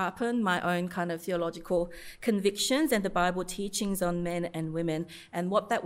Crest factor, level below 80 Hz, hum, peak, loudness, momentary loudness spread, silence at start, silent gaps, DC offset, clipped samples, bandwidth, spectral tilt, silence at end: 18 dB; -54 dBFS; none; -12 dBFS; -30 LUFS; 7 LU; 0 s; none; under 0.1%; under 0.1%; 16 kHz; -4.5 dB/octave; 0 s